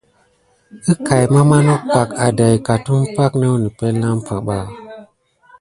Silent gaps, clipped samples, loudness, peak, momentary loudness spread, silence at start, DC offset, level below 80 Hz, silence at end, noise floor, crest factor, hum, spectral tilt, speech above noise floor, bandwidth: none; under 0.1%; -15 LUFS; 0 dBFS; 11 LU; 0.75 s; under 0.1%; -46 dBFS; 0.6 s; -57 dBFS; 16 dB; none; -7 dB/octave; 43 dB; 11.5 kHz